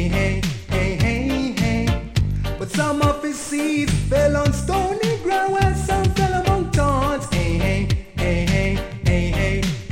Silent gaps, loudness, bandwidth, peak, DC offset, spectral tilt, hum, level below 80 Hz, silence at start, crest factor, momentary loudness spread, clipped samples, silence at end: none; -20 LUFS; 16.5 kHz; -4 dBFS; under 0.1%; -6 dB/octave; none; -28 dBFS; 0 s; 16 dB; 5 LU; under 0.1%; 0 s